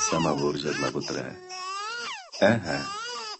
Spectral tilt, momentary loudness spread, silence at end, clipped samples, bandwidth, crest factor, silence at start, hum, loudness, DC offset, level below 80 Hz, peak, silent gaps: -3.5 dB/octave; 11 LU; 0 s; under 0.1%; 8.6 kHz; 22 dB; 0 s; none; -28 LUFS; under 0.1%; -56 dBFS; -6 dBFS; none